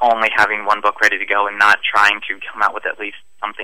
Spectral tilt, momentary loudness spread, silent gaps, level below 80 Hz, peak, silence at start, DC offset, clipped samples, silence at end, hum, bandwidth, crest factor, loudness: -1.5 dB/octave; 14 LU; none; -60 dBFS; -2 dBFS; 0 s; 1%; under 0.1%; 0 s; none; 16 kHz; 16 dB; -15 LUFS